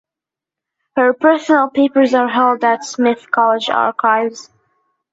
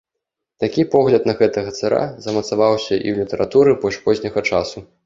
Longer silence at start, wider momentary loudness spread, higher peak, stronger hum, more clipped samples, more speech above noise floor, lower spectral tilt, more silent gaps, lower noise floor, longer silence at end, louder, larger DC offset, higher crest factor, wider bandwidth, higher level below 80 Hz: first, 0.95 s vs 0.6 s; second, 4 LU vs 8 LU; about the same, -2 dBFS vs 0 dBFS; neither; neither; first, 73 dB vs 63 dB; second, -3.5 dB/octave vs -6 dB/octave; neither; first, -87 dBFS vs -81 dBFS; first, 0.7 s vs 0.2 s; first, -14 LUFS vs -18 LUFS; neither; about the same, 14 dB vs 16 dB; about the same, 8 kHz vs 7.6 kHz; second, -64 dBFS vs -50 dBFS